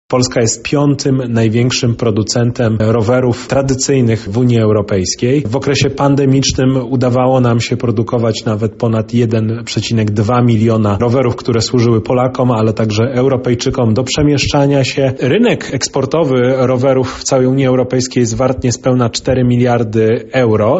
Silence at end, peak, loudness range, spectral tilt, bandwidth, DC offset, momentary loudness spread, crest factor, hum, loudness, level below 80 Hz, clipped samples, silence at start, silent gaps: 0 s; 0 dBFS; 1 LU; -6 dB/octave; 8.2 kHz; under 0.1%; 3 LU; 12 dB; none; -13 LUFS; -38 dBFS; under 0.1%; 0.1 s; none